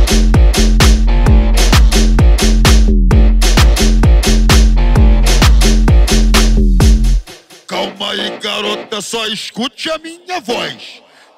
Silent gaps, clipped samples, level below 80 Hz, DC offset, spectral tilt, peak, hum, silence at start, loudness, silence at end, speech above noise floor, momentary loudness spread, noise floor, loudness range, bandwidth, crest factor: none; under 0.1%; -10 dBFS; under 0.1%; -4.5 dB/octave; 0 dBFS; none; 0 s; -12 LUFS; 0.45 s; 14 dB; 10 LU; -35 dBFS; 8 LU; 15 kHz; 10 dB